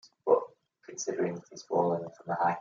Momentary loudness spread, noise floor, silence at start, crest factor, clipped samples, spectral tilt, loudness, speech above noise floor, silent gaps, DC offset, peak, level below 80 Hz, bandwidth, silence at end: 15 LU; -52 dBFS; 0.25 s; 20 dB; under 0.1%; -5 dB/octave; -31 LUFS; 21 dB; none; under 0.1%; -12 dBFS; -82 dBFS; 7.4 kHz; 0 s